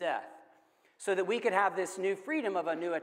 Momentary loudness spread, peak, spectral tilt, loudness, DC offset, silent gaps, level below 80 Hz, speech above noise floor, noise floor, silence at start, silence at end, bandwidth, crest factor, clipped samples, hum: 9 LU; -14 dBFS; -4 dB/octave; -32 LUFS; under 0.1%; none; under -90 dBFS; 35 dB; -66 dBFS; 0 s; 0 s; 15.5 kHz; 18 dB; under 0.1%; none